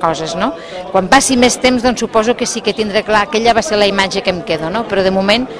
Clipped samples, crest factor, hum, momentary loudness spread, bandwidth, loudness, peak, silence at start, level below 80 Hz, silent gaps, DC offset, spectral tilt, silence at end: 0.3%; 14 dB; none; 7 LU; 11 kHz; -13 LUFS; 0 dBFS; 0 s; -40 dBFS; none; under 0.1%; -3.5 dB/octave; 0 s